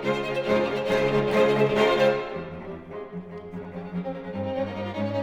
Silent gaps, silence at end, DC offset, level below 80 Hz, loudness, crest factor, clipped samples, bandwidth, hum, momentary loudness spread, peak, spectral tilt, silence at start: none; 0 s; under 0.1%; -54 dBFS; -25 LUFS; 18 dB; under 0.1%; 15.5 kHz; none; 17 LU; -8 dBFS; -6.5 dB/octave; 0 s